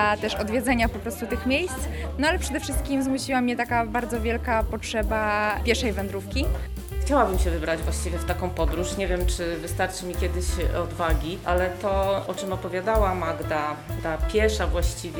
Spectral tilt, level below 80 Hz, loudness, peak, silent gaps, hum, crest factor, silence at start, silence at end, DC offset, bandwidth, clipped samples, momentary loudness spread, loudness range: -5 dB/octave; -30 dBFS; -26 LUFS; -6 dBFS; none; none; 20 dB; 0 s; 0 s; under 0.1%; over 20 kHz; under 0.1%; 6 LU; 2 LU